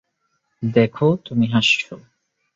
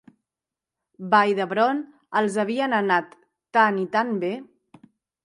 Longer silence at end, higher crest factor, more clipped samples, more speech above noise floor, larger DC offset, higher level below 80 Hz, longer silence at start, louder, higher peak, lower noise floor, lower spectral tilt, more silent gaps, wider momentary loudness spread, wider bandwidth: second, 0.6 s vs 0.8 s; about the same, 20 dB vs 20 dB; neither; second, 52 dB vs 67 dB; neither; first, -58 dBFS vs -78 dBFS; second, 0.6 s vs 1 s; first, -18 LUFS vs -22 LUFS; about the same, -2 dBFS vs -4 dBFS; second, -71 dBFS vs -89 dBFS; about the same, -5.5 dB/octave vs -5.5 dB/octave; neither; about the same, 8 LU vs 10 LU; second, 7.8 kHz vs 11.5 kHz